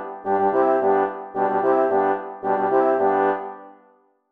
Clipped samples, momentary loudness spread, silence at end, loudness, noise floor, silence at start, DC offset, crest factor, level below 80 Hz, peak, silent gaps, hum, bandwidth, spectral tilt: under 0.1%; 7 LU; 0.6 s; -21 LUFS; -58 dBFS; 0 s; under 0.1%; 14 dB; -74 dBFS; -6 dBFS; none; none; 3.8 kHz; -8.5 dB/octave